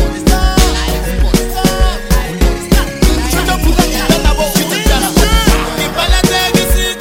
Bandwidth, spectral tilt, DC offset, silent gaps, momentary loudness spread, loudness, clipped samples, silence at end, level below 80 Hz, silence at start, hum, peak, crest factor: 17 kHz; -4 dB/octave; under 0.1%; none; 5 LU; -12 LUFS; under 0.1%; 0 s; -14 dBFS; 0 s; none; 0 dBFS; 10 dB